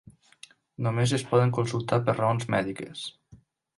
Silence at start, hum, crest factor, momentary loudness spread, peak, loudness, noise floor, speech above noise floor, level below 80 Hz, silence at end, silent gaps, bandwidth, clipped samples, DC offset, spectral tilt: 0.8 s; none; 18 dB; 14 LU; -10 dBFS; -27 LUFS; -56 dBFS; 31 dB; -60 dBFS; 0.45 s; none; 11.5 kHz; under 0.1%; under 0.1%; -6 dB/octave